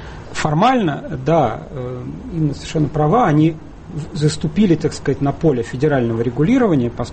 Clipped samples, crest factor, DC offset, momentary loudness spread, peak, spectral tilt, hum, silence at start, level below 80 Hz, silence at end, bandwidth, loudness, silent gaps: under 0.1%; 14 dB; under 0.1%; 13 LU; -2 dBFS; -7 dB/octave; none; 0 s; -38 dBFS; 0 s; 8.8 kHz; -17 LUFS; none